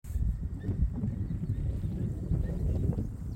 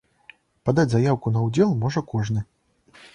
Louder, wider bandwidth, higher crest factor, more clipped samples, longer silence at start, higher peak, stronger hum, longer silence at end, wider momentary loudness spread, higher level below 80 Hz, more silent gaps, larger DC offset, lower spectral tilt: second, -34 LUFS vs -23 LUFS; first, 13 kHz vs 10 kHz; about the same, 14 dB vs 18 dB; neither; second, 0.05 s vs 0.65 s; second, -16 dBFS vs -6 dBFS; neither; second, 0 s vs 0.7 s; second, 4 LU vs 9 LU; first, -36 dBFS vs -52 dBFS; neither; neither; first, -10 dB/octave vs -7.5 dB/octave